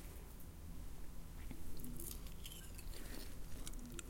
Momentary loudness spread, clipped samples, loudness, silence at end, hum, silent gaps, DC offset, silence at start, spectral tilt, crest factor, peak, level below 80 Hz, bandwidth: 6 LU; under 0.1%; -53 LUFS; 0 s; none; none; under 0.1%; 0 s; -4 dB/octave; 16 dB; -30 dBFS; -52 dBFS; 17 kHz